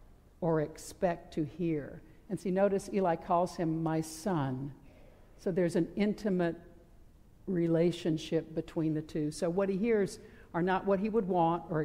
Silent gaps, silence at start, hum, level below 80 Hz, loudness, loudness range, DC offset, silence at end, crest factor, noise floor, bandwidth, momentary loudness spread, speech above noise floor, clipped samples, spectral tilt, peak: none; 0.4 s; none; -58 dBFS; -33 LUFS; 2 LU; under 0.1%; 0 s; 16 dB; -57 dBFS; 15.5 kHz; 10 LU; 25 dB; under 0.1%; -7 dB/octave; -18 dBFS